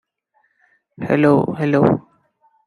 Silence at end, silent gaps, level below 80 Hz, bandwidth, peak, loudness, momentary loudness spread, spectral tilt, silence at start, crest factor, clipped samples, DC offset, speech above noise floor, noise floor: 0.65 s; none; -56 dBFS; 10.5 kHz; -2 dBFS; -17 LUFS; 9 LU; -9 dB/octave; 1 s; 18 dB; under 0.1%; under 0.1%; 49 dB; -65 dBFS